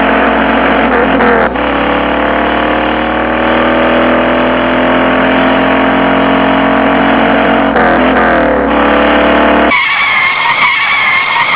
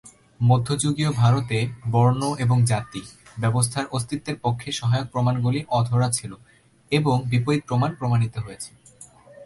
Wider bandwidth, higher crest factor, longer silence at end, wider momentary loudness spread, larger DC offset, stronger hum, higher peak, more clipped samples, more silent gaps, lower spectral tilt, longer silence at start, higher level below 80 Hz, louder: second, 4 kHz vs 11.5 kHz; second, 8 dB vs 16 dB; about the same, 0 s vs 0 s; second, 3 LU vs 9 LU; first, 0.5% vs under 0.1%; neither; first, 0 dBFS vs -6 dBFS; first, 0.1% vs under 0.1%; neither; first, -8.5 dB/octave vs -6 dB/octave; about the same, 0 s vs 0.05 s; first, -30 dBFS vs -52 dBFS; first, -8 LUFS vs -23 LUFS